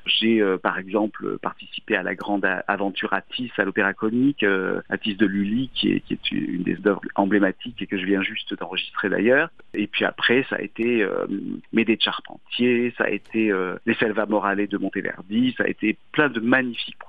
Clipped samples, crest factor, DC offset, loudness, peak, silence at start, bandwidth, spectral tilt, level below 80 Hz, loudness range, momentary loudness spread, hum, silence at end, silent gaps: under 0.1%; 20 dB; 0.4%; -23 LUFS; -4 dBFS; 0.05 s; 5 kHz; -7.5 dB/octave; -58 dBFS; 1 LU; 8 LU; none; 0.05 s; none